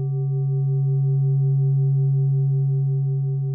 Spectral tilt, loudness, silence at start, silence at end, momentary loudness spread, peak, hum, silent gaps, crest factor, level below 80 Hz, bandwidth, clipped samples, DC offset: -18.5 dB/octave; -21 LUFS; 0 s; 0 s; 3 LU; -14 dBFS; none; none; 6 dB; -70 dBFS; 1.2 kHz; under 0.1%; under 0.1%